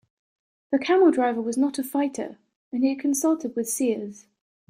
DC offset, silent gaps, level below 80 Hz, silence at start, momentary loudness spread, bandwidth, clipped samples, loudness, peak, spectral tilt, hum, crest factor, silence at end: under 0.1%; 2.56-2.71 s; -74 dBFS; 0.7 s; 14 LU; 16 kHz; under 0.1%; -24 LUFS; -8 dBFS; -3.5 dB/octave; none; 16 dB; 0.55 s